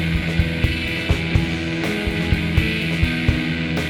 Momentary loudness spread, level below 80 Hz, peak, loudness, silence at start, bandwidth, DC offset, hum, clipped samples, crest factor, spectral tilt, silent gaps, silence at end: 3 LU; -28 dBFS; -4 dBFS; -21 LUFS; 0 s; 17 kHz; under 0.1%; none; under 0.1%; 16 dB; -6 dB/octave; none; 0 s